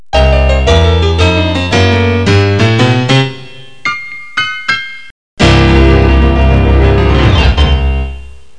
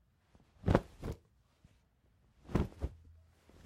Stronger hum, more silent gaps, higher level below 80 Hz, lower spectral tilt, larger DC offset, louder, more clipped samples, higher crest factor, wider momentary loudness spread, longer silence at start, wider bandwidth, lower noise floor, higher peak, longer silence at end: neither; first, 5.11-5.37 s vs none; first, -14 dBFS vs -48 dBFS; second, -6 dB/octave vs -8 dB/octave; first, 3% vs under 0.1%; first, -10 LUFS vs -38 LUFS; neither; second, 8 dB vs 28 dB; second, 11 LU vs 14 LU; second, 0.15 s vs 0.65 s; second, 9.8 kHz vs 15 kHz; second, -32 dBFS vs -71 dBFS; first, 0 dBFS vs -12 dBFS; second, 0.25 s vs 0.7 s